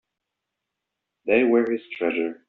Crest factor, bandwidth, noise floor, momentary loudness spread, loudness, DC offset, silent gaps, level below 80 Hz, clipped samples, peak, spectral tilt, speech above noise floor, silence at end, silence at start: 18 dB; 4.2 kHz; -83 dBFS; 8 LU; -22 LUFS; under 0.1%; none; -66 dBFS; under 0.1%; -6 dBFS; -3.5 dB/octave; 61 dB; 0.15 s; 1.25 s